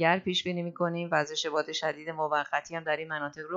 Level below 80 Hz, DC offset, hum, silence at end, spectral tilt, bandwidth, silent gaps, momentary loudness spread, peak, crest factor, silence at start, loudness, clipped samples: -74 dBFS; under 0.1%; none; 0 s; -4 dB/octave; 7.8 kHz; none; 6 LU; -10 dBFS; 20 dB; 0 s; -30 LUFS; under 0.1%